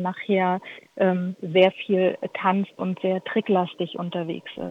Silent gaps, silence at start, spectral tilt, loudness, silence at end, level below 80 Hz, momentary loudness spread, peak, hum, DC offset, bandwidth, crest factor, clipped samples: none; 0 s; -8 dB/octave; -24 LUFS; 0 s; -68 dBFS; 11 LU; -4 dBFS; none; under 0.1%; 5.8 kHz; 20 dB; under 0.1%